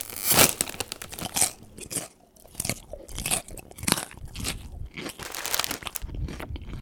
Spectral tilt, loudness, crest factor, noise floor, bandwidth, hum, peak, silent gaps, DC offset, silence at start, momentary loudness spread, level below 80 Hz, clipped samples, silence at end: -1.5 dB/octave; -27 LUFS; 30 dB; -52 dBFS; over 20 kHz; none; 0 dBFS; none; under 0.1%; 0 s; 18 LU; -44 dBFS; under 0.1%; 0 s